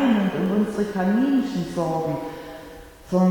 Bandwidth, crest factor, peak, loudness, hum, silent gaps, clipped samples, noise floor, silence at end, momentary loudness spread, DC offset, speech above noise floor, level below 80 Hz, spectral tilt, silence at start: 18.5 kHz; 14 dB; -8 dBFS; -23 LUFS; none; none; under 0.1%; -42 dBFS; 0 s; 18 LU; under 0.1%; 19 dB; -50 dBFS; -7.5 dB/octave; 0 s